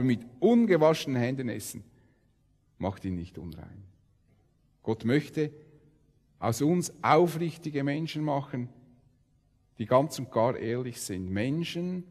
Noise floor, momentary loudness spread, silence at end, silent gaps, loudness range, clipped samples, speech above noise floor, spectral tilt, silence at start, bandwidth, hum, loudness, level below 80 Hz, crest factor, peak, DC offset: -67 dBFS; 17 LU; 0.05 s; none; 8 LU; under 0.1%; 39 dB; -6 dB/octave; 0 s; 14 kHz; none; -29 LUFS; -64 dBFS; 22 dB; -8 dBFS; under 0.1%